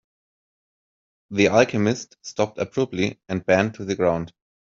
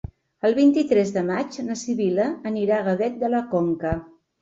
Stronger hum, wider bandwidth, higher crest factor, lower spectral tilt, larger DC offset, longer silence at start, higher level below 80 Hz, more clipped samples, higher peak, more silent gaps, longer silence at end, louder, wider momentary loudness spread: neither; about the same, 7.6 kHz vs 7.8 kHz; first, 20 dB vs 14 dB; about the same, -5.5 dB/octave vs -6.5 dB/octave; neither; first, 1.3 s vs 0.45 s; second, -60 dBFS vs -48 dBFS; neither; first, -4 dBFS vs -8 dBFS; neither; about the same, 0.35 s vs 0.35 s; about the same, -22 LUFS vs -23 LUFS; about the same, 12 LU vs 10 LU